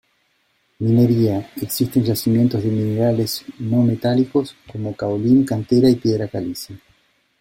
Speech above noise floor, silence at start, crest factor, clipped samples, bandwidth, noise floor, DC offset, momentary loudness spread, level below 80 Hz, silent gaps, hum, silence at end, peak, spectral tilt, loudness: 46 dB; 0.8 s; 14 dB; under 0.1%; 16.5 kHz; -64 dBFS; under 0.1%; 11 LU; -52 dBFS; none; none; 0.65 s; -4 dBFS; -7 dB/octave; -19 LUFS